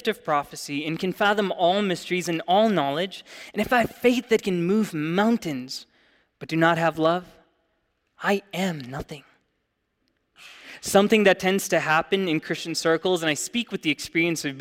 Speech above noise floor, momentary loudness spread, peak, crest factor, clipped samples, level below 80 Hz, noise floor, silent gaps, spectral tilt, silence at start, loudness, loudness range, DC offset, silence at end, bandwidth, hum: 51 dB; 13 LU; -4 dBFS; 20 dB; under 0.1%; -60 dBFS; -75 dBFS; none; -4.5 dB/octave; 0.05 s; -23 LUFS; 6 LU; under 0.1%; 0 s; 16.5 kHz; none